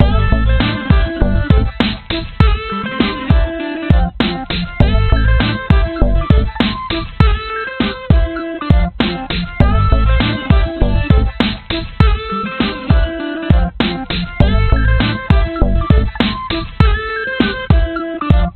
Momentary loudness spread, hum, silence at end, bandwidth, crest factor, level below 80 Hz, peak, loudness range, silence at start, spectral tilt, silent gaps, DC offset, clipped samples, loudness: 7 LU; none; 0.05 s; 4.5 kHz; 14 dB; -16 dBFS; 0 dBFS; 1 LU; 0 s; -9 dB/octave; none; under 0.1%; 0.2%; -15 LUFS